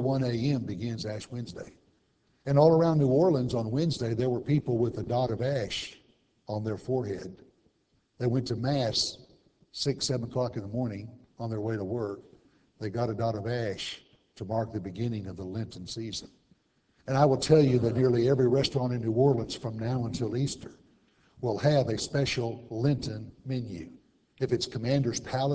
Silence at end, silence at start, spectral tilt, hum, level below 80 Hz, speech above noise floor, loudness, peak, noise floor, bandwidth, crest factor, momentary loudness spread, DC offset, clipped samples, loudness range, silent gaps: 0 s; 0 s; -6.5 dB/octave; none; -56 dBFS; 43 dB; -29 LUFS; -8 dBFS; -71 dBFS; 8 kHz; 22 dB; 15 LU; under 0.1%; under 0.1%; 8 LU; none